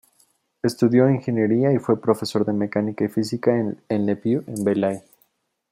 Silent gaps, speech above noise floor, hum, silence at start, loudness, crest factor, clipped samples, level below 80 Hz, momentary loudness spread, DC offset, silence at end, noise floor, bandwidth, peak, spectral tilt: none; 45 dB; none; 0.65 s; -22 LUFS; 18 dB; under 0.1%; -64 dBFS; 6 LU; under 0.1%; 0.7 s; -66 dBFS; 15.5 kHz; -4 dBFS; -7.5 dB/octave